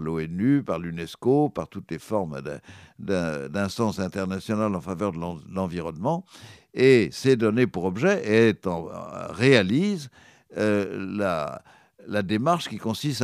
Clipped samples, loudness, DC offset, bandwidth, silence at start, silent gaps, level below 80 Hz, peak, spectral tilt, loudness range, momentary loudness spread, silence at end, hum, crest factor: under 0.1%; -25 LUFS; under 0.1%; 14.5 kHz; 0 s; none; -58 dBFS; -2 dBFS; -6.5 dB/octave; 6 LU; 15 LU; 0 s; none; 22 dB